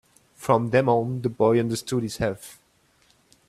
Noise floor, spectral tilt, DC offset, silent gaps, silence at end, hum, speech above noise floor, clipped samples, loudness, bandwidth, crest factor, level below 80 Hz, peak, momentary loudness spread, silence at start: -63 dBFS; -6.5 dB/octave; under 0.1%; none; 0.95 s; none; 40 dB; under 0.1%; -23 LUFS; 14 kHz; 20 dB; -54 dBFS; -4 dBFS; 12 LU; 0.4 s